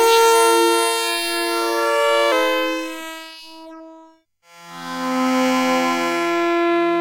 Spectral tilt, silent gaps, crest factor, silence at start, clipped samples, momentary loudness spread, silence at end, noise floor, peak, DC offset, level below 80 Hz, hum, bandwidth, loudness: -1.5 dB/octave; none; 14 dB; 0 s; under 0.1%; 20 LU; 0 s; -52 dBFS; -4 dBFS; under 0.1%; -70 dBFS; none; 16.5 kHz; -18 LUFS